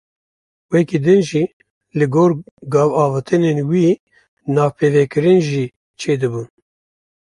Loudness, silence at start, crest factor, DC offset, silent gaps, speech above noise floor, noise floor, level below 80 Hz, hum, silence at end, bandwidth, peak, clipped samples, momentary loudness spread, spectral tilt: -17 LUFS; 0.7 s; 14 dB; under 0.1%; 1.53-1.60 s, 1.70-1.81 s, 2.51-2.57 s, 4.00-4.07 s, 4.28-4.37 s, 5.76-5.94 s; over 75 dB; under -90 dBFS; -58 dBFS; none; 0.75 s; 11 kHz; -2 dBFS; under 0.1%; 12 LU; -7.5 dB/octave